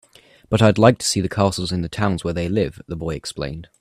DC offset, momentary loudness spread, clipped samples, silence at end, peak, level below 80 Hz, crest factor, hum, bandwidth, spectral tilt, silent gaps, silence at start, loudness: under 0.1%; 13 LU; under 0.1%; 0.15 s; 0 dBFS; -44 dBFS; 20 dB; none; 15 kHz; -5.5 dB/octave; none; 0.5 s; -20 LUFS